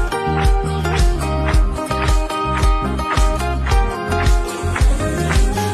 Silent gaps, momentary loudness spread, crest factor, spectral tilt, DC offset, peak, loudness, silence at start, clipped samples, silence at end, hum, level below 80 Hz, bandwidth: none; 2 LU; 12 dB; -5.5 dB/octave; under 0.1%; -4 dBFS; -18 LUFS; 0 s; under 0.1%; 0 s; none; -18 dBFS; 13.5 kHz